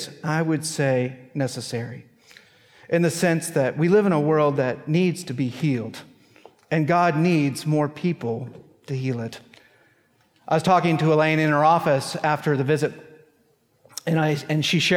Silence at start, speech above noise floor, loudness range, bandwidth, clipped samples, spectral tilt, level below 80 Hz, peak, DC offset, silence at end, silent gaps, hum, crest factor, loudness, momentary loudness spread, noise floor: 0 s; 42 dB; 5 LU; 16 kHz; under 0.1%; -6 dB/octave; -68 dBFS; -6 dBFS; under 0.1%; 0 s; none; none; 16 dB; -22 LUFS; 12 LU; -63 dBFS